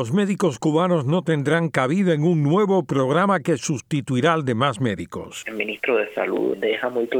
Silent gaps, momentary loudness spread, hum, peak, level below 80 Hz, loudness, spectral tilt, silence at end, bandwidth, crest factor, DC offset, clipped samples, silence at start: none; 7 LU; none; -4 dBFS; -62 dBFS; -21 LUFS; -6 dB/octave; 0 s; 15.5 kHz; 16 dB; under 0.1%; under 0.1%; 0 s